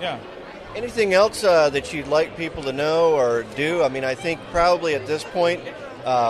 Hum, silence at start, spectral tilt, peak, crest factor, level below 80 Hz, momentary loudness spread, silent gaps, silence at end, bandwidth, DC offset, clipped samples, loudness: none; 0 s; -4.5 dB/octave; -4 dBFS; 16 dB; -48 dBFS; 14 LU; none; 0 s; 13 kHz; under 0.1%; under 0.1%; -21 LUFS